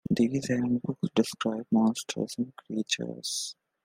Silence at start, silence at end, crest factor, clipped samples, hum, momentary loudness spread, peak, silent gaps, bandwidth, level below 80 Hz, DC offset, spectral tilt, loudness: 0.1 s; 0.35 s; 20 dB; under 0.1%; none; 8 LU; -10 dBFS; none; 16 kHz; -66 dBFS; under 0.1%; -4.5 dB/octave; -29 LUFS